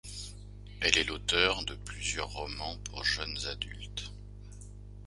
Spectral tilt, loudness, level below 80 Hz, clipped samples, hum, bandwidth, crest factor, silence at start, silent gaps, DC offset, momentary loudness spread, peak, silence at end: -2 dB/octave; -31 LUFS; -46 dBFS; under 0.1%; 50 Hz at -45 dBFS; 11.5 kHz; 32 dB; 0.05 s; none; under 0.1%; 23 LU; -2 dBFS; 0 s